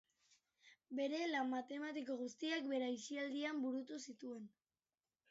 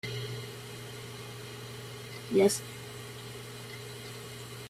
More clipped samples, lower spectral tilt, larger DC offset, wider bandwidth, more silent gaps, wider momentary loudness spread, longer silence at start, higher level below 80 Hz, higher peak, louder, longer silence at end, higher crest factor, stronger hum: neither; second, -1 dB/octave vs -4.5 dB/octave; neither; second, 7.6 kHz vs 16 kHz; neither; second, 11 LU vs 16 LU; first, 0.65 s vs 0.05 s; second, under -90 dBFS vs -66 dBFS; second, -28 dBFS vs -12 dBFS; second, -44 LUFS vs -36 LUFS; first, 0.8 s vs 0 s; second, 16 dB vs 22 dB; neither